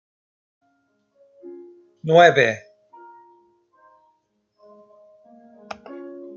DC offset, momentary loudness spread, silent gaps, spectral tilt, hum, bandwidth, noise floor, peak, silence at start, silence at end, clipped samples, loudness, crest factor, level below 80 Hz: under 0.1%; 29 LU; none; -5 dB/octave; none; 7.2 kHz; -69 dBFS; -2 dBFS; 1.45 s; 0.1 s; under 0.1%; -17 LUFS; 22 dB; -74 dBFS